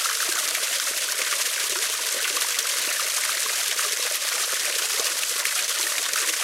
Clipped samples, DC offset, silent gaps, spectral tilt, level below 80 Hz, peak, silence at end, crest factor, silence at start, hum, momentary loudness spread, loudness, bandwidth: under 0.1%; under 0.1%; none; 4 dB/octave; -80 dBFS; -8 dBFS; 0 s; 18 dB; 0 s; none; 1 LU; -22 LUFS; 16.5 kHz